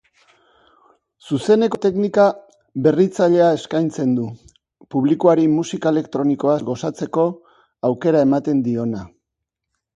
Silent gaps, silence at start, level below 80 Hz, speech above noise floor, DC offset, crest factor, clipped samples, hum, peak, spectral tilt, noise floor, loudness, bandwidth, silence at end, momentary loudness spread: none; 1.25 s; -60 dBFS; 64 dB; under 0.1%; 18 dB; under 0.1%; none; -2 dBFS; -7 dB/octave; -81 dBFS; -18 LUFS; 11 kHz; 0.9 s; 10 LU